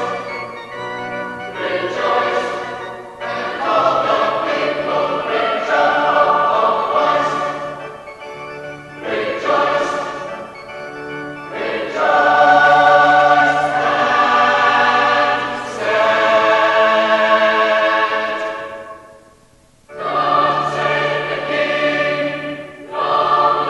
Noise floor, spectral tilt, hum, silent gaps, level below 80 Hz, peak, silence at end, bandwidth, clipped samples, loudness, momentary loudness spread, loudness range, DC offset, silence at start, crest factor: -50 dBFS; -4 dB/octave; none; none; -56 dBFS; 0 dBFS; 0 s; 11.5 kHz; under 0.1%; -15 LUFS; 16 LU; 9 LU; under 0.1%; 0 s; 16 dB